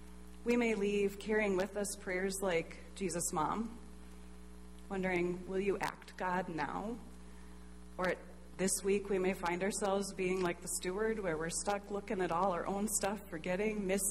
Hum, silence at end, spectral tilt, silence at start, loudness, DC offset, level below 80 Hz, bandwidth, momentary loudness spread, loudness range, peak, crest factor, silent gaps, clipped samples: none; 0 s; -4 dB/octave; 0 s; -36 LUFS; 0.2%; -56 dBFS; 16 kHz; 21 LU; 4 LU; -20 dBFS; 16 dB; none; under 0.1%